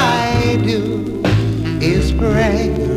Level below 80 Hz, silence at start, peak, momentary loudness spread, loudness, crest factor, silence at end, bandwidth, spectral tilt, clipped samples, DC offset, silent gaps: -24 dBFS; 0 s; -2 dBFS; 4 LU; -16 LUFS; 14 dB; 0 s; 15 kHz; -6.5 dB/octave; under 0.1%; 0.2%; none